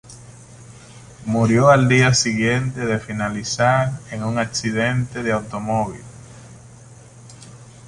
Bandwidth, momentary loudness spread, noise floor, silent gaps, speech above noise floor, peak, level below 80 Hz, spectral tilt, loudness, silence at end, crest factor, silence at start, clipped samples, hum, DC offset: 11.5 kHz; 12 LU; -43 dBFS; none; 25 dB; -2 dBFS; -48 dBFS; -5 dB/octave; -19 LUFS; 0 s; 18 dB; 0.1 s; under 0.1%; none; under 0.1%